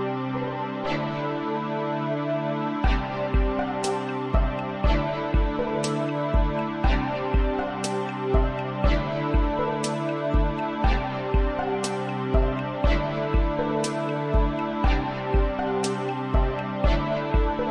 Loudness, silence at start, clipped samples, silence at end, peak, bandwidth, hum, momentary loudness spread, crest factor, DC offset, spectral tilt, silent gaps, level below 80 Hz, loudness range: -26 LUFS; 0 s; under 0.1%; 0 s; -8 dBFS; 11 kHz; none; 3 LU; 16 dB; under 0.1%; -6.5 dB/octave; none; -28 dBFS; 1 LU